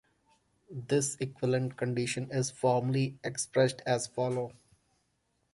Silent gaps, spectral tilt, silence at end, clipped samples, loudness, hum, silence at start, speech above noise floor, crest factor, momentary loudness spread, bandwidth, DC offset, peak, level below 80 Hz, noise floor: none; -5 dB/octave; 1 s; under 0.1%; -31 LUFS; none; 0.7 s; 46 dB; 20 dB; 7 LU; 11.5 kHz; under 0.1%; -12 dBFS; -68 dBFS; -77 dBFS